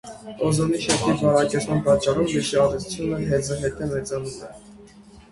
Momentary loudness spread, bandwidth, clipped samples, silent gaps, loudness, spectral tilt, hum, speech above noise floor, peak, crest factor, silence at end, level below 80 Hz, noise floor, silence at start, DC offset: 11 LU; 11.5 kHz; under 0.1%; none; -22 LUFS; -5 dB/octave; none; 25 dB; -4 dBFS; 18 dB; 0.1 s; -46 dBFS; -47 dBFS; 0.05 s; under 0.1%